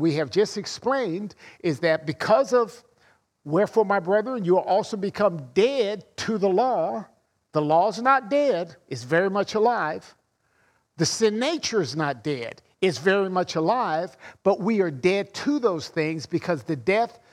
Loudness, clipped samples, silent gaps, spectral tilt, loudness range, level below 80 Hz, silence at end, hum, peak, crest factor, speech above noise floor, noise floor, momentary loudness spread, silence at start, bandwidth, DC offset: -24 LUFS; under 0.1%; none; -5 dB/octave; 2 LU; -68 dBFS; 0.2 s; none; -6 dBFS; 18 dB; 43 dB; -67 dBFS; 8 LU; 0 s; 13 kHz; under 0.1%